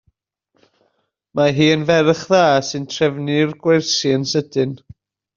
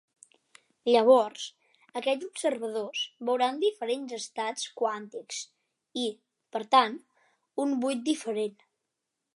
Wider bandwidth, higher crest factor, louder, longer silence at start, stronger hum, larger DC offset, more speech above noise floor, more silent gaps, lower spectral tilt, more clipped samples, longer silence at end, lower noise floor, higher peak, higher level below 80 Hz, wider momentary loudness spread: second, 7.6 kHz vs 11.5 kHz; about the same, 16 dB vs 20 dB; first, -17 LUFS vs -29 LUFS; first, 1.35 s vs 0.85 s; neither; neither; second, 51 dB vs 57 dB; neither; first, -4 dB/octave vs -2.5 dB/octave; neither; second, 0.6 s vs 0.85 s; second, -67 dBFS vs -85 dBFS; first, -2 dBFS vs -8 dBFS; first, -58 dBFS vs -88 dBFS; second, 9 LU vs 15 LU